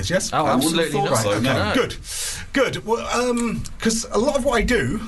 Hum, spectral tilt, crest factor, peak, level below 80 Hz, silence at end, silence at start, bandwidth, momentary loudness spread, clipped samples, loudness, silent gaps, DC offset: none; -4 dB/octave; 12 dB; -8 dBFS; -36 dBFS; 0 s; 0 s; 12.5 kHz; 6 LU; under 0.1%; -21 LUFS; none; under 0.1%